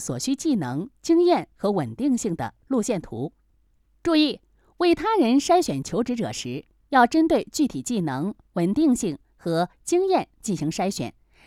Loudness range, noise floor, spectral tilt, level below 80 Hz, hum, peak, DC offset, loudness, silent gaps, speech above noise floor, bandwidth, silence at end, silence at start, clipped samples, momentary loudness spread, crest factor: 3 LU; -63 dBFS; -5 dB/octave; -54 dBFS; none; -6 dBFS; under 0.1%; -24 LUFS; none; 40 dB; 14.5 kHz; 0.35 s; 0 s; under 0.1%; 12 LU; 18 dB